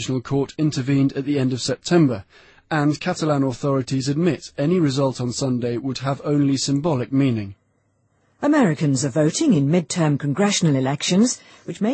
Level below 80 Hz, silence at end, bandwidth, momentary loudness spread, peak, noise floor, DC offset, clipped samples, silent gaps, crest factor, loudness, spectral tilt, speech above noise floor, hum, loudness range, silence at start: -56 dBFS; 0 s; 8.8 kHz; 7 LU; -4 dBFS; -65 dBFS; under 0.1%; under 0.1%; none; 16 dB; -21 LUFS; -5.5 dB/octave; 45 dB; none; 2 LU; 0 s